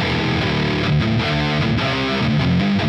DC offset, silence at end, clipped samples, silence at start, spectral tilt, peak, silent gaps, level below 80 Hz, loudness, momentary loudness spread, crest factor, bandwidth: under 0.1%; 0 s; under 0.1%; 0 s; -6.5 dB/octave; -6 dBFS; none; -34 dBFS; -18 LUFS; 2 LU; 12 dB; 8.4 kHz